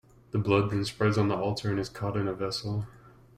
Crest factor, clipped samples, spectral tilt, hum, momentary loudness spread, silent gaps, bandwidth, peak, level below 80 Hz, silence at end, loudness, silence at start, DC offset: 20 dB; under 0.1%; -6.5 dB/octave; none; 9 LU; none; 12.5 kHz; -10 dBFS; -56 dBFS; 0.3 s; -29 LUFS; 0.35 s; under 0.1%